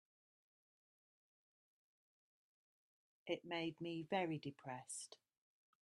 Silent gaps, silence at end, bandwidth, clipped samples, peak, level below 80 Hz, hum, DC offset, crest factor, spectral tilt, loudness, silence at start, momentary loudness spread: none; 0.7 s; 11.5 kHz; under 0.1%; -28 dBFS; under -90 dBFS; none; under 0.1%; 24 dB; -4.5 dB/octave; -46 LUFS; 3.25 s; 14 LU